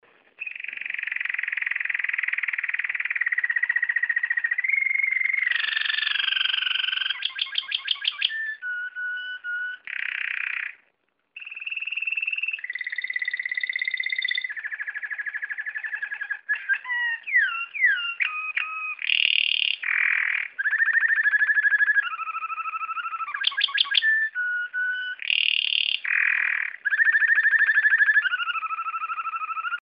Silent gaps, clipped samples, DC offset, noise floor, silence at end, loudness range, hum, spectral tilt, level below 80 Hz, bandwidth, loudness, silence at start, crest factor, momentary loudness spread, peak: none; under 0.1%; under 0.1%; -71 dBFS; 0.05 s; 8 LU; none; 0 dB/octave; -86 dBFS; 5.6 kHz; -23 LUFS; 0.4 s; 22 dB; 11 LU; -4 dBFS